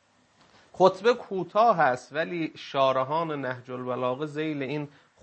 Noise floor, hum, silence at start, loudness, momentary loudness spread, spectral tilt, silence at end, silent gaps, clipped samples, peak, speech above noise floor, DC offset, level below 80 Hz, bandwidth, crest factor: -62 dBFS; none; 0.75 s; -26 LUFS; 12 LU; -6 dB/octave; 0.35 s; none; under 0.1%; -4 dBFS; 36 dB; under 0.1%; -76 dBFS; 8.6 kHz; 22 dB